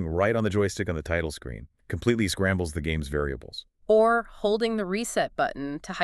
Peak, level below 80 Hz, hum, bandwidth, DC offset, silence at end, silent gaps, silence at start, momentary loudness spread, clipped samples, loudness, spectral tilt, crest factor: -8 dBFS; -42 dBFS; none; 13.5 kHz; under 0.1%; 0 s; none; 0 s; 14 LU; under 0.1%; -26 LUFS; -5.5 dB/octave; 18 dB